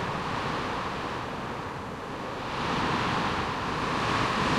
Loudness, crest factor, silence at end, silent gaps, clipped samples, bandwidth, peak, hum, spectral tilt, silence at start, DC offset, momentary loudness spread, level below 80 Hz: -30 LUFS; 16 dB; 0 s; none; under 0.1%; 15.5 kHz; -14 dBFS; none; -5 dB/octave; 0 s; under 0.1%; 9 LU; -48 dBFS